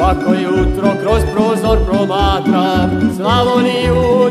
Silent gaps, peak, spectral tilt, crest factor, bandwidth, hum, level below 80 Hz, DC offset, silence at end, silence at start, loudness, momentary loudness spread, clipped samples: none; 0 dBFS; -6.5 dB/octave; 12 dB; 15 kHz; none; -22 dBFS; under 0.1%; 0 s; 0 s; -13 LUFS; 3 LU; under 0.1%